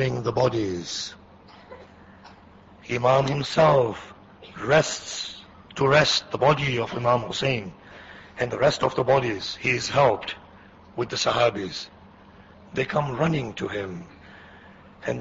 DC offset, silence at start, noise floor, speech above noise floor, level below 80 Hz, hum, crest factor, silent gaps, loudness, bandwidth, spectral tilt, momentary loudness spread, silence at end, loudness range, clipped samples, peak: under 0.1%; 0 s; -50 dBFS; 27 dB; -54 dBFS; none; 20 dB; none; -24 LUFS; 8 kHz; -4.5 dB/octave; 19 LU; 0 s; 5 LU; under 0.1%; -6 dBFS